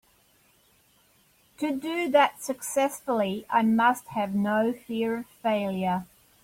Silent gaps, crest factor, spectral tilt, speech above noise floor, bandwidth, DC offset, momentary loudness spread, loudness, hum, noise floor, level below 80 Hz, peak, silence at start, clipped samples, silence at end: none; 18 dB; -5 dB/octave; 37 dB; 16.5 kHz; under 0.1%; 8 LU; -26 LUFS; none; -63 dBFS; -68 dBFS; -8 dBFS; 1.6 s; under 0.1%; 0.4 s